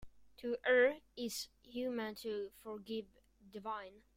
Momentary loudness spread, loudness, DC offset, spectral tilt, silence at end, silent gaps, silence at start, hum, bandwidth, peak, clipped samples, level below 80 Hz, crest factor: 16 LU; -39 LUFS; under 0.1%; -3 dB/octave; 0.2 s; none; 0 s; none; 16 kHz; -20 dBFS; under 0.1%; -70 dBFS; 20 dB